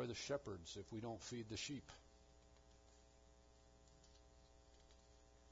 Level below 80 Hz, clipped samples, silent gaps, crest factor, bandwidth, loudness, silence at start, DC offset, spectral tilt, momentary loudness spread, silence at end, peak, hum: -70 dBFS; under 0.1%; none; 20 dB; 7.4 kHz; -50 LUFS; 0 s; under 0.1%; -4 dB/octave; 22 LU; 0 s; -32 dBFS; none